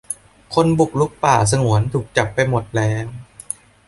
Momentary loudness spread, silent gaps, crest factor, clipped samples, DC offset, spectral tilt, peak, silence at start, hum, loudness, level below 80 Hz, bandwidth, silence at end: 15 LU; none; 18 dB; under 0.1%; under 0.1%; -5.5 dB/octave; -2 dBFS; 0.1 s; none; -18 LUFS; -44 dBFS; 11.5 kHz; 0.65 s